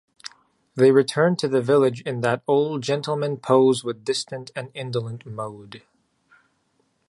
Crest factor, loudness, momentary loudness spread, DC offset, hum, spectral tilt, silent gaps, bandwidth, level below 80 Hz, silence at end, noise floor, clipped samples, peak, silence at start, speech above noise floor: 20 dB; -22 LUFS; 16 LU; under 0.1%; none; -5.5 dB/octave; none; 11.5 kHz; -68 dBFS; 1.3 s; -68 dBFS; under 0.1%; -4 dBFS; 0.25 s; 47 dB